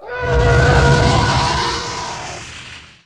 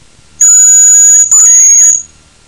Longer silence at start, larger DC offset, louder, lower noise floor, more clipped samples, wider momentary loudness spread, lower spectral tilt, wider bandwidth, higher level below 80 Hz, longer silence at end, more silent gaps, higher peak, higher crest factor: second, 0 s vs 0.4 s; first, 0.3% vs under 0.1%; second, -15 LUFS vs -1 LUFS; first, -36 dBFS vs -26 dBFS; second, under 0.1% vs 0.3%; first, 18 LU vs 5 LU; first, -5 dB/octave vs 3 dB/octave; second, 11 kHz vs 17.5 kHz; first, -24 dBFS vs -50 dBFS; second, 0.25 s vs 0.45 s; neither; about the same, 0 dBFS vs 0 dBFS; first, 16 dB vs 6 dB